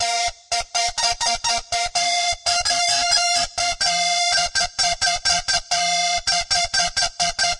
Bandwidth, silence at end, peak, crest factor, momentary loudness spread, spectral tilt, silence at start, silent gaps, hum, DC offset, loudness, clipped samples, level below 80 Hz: 11.5 kHz; 0 s; -6 dBFS; 14 dB; 4 LU; 1 dB/octave; 0 s; none; none; under 0.1%; -19 LUFS; under 0.1%; -44 dBFS